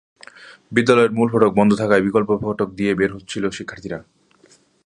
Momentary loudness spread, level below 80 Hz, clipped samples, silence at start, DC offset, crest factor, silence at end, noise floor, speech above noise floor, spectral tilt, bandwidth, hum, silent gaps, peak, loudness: 15 LU; -52 dBFS; under 0.1%; 0.4 s; under 0.1%; 18 dB; 0.85 s; -54 dBFS; 37 dB; -6.5 dB/octave; 10.5 kHz; none; none; 0 dBFS; -18 LUFS